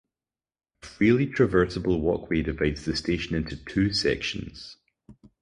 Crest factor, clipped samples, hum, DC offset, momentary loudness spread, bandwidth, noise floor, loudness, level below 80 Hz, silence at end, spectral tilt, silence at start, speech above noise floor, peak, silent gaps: 18 dB; under 0.1%; none; under 0.1%; 14 LU; 11 kHz; under -90 dBFS; -25 LUFS; -42 dBFS; 0.3 s; -6 dB/octave; 0.85 s; over 65 dB; -8 dBFS; none